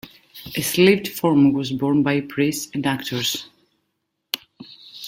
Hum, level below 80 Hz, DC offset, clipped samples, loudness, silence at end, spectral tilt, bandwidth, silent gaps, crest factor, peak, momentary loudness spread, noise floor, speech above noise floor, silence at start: none; -58 dBFS; under 0.1%; under 0.1%; -20 LUFS; 0 s; -4.5 dB/octave; 17 kHz; none; 20 dB; -2 dBFS; 14 LU; -75 dBFS; 56 dB; 0.05 s